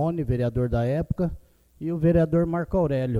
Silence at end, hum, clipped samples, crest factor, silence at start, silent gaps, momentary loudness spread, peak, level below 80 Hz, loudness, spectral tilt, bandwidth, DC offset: 0 s; none; under 0.1%; 16 dB; 0 s; none; 8 LU; -8 dBFS; -38 dBFS; -24 LUFS; -10 dB/octave; 5.2 kHz; under 0.1%